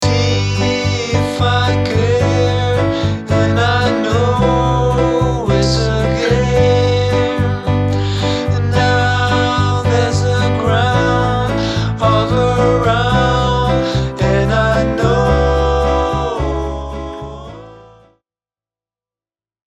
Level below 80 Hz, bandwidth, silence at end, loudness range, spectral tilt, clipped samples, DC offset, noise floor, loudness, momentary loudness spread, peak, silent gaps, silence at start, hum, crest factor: -26 dBFS; 9.2 kHz; 1.9 s; 3 LU; -6 dB/octave; under 0.1%; under 0.1%; under -90 dBFS; -14 LUFS; 4 LU; 0 dBFS; none; 0 s; none; 14 dB